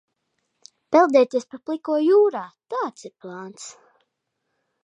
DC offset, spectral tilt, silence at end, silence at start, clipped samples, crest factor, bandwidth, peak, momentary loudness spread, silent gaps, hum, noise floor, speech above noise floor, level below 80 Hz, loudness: under 0.1%; -4.5 dB/octave; 1.15 s; 0.9 s; under 0.1%; 20 dB; 9.8 kHz; -4 dBFS; 21 LU; none; none; -78 dBFS; 56 dB; -82 dBFS; -20 LUFS